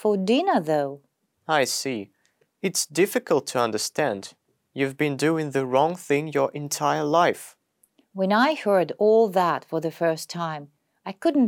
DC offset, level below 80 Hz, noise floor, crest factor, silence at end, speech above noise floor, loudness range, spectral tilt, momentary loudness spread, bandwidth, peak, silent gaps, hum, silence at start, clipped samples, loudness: under 0.1%; -76 dBFS; -64 dBFS; 18 dB; 0 s; 41 dB; 3 LU; -4.5 dB/octave; 15 LU; 18 kHz; -6 dBFS; none; none; 0 s; under 0.1%; -24 LUFS